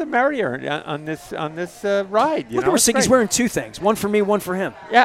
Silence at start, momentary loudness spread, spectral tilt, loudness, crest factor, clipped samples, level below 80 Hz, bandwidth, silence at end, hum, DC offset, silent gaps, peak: 0 s; 12 LU; -3.5 dB/octave; -20 LUFS; 20 dB; under 0.1%; -52 dBFS; 16.5 kHz; 0 s; none; under 0.1%; none; 0 dBFS